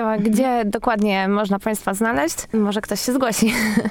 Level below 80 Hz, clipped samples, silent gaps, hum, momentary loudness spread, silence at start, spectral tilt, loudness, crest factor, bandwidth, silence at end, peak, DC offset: -46 dBFS; under 0.1%; none; none; 4 LU; 0 s; -4.5 dB/octave; -20 LUFS; 16 dB; 19.5 kHz; 0 s; -4 dBFS; under 0.1%